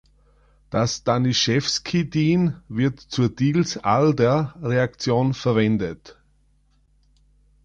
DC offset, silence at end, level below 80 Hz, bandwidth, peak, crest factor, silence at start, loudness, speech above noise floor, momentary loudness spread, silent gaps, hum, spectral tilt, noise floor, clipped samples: under 0.1%; 1.5 s; -50 dBFS; 9 kHz; -6 dBFS; 16 dB; 0.7 s; -21 LUFS; 40 dB; 5 LU; none; none; -5.5 dB/octave; -61 dBFS; under 0.1%